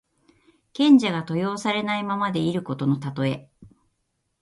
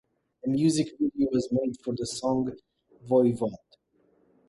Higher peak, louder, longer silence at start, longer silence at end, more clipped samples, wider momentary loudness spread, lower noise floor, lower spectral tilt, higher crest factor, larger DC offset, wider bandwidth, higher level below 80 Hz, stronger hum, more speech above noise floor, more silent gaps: first, -6 dBFS vs -10 dBFS; first, -23 LUFS vs -27 LUFS; first, 0.75 s vs 0.45 s; second, 0.75 s vs 0.9 s; neither; about the same, 10 LU vs 9 LU; first, -74 dBFS vs -67 dBFS; about the same, -6.5 dB/octave vs -6.5 dB/octave; about the same, 18 dB vs 18 dB; neither; about the same, 11.5 kHz vs 11.5 kHz; about the same, -64 dBFS vs -62 dBFS; neither; first, 52 dB vs 41 dB; neither